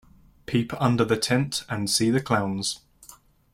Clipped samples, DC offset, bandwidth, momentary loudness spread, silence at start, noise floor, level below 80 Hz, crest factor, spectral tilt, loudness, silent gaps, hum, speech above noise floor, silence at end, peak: under 0.1%; under 0.1%; 16.5 kHz; 7 LU; 0.5 s; -52 dBFS; -56 dBFS; 18 dB; -4.5 dB/octave; -24 LUFS; none; none; 28 dB; 0.4 s; -6 dBFS